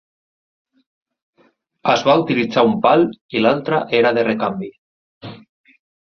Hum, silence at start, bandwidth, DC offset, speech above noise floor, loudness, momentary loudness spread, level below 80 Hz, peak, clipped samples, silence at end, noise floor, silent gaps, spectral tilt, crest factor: none; 1.85 s; 6.8 kHz; under 0.1%; 43 dB; -16 LUFS; 21 LU; -60 dBFS; -2 dBFS; under 0.1%; 0.8 s; -59 dBFS; 3.21-3.29 s, 4.78-5.21 s; -6 dB/octave; 18 dB